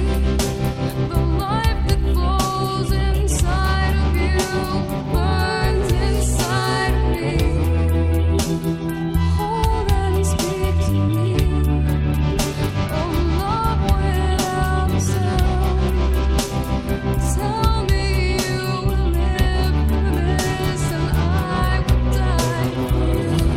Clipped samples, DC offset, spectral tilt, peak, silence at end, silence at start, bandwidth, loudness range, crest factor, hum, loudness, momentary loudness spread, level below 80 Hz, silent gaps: under 0.1%; under 0.1%; -6 dB/octave; -4 dBFS; 0 s; 0 s; 16 kHz; 1 LU; 14 dB; none; -20 LUFS; 3 LU; -22 dBFS; none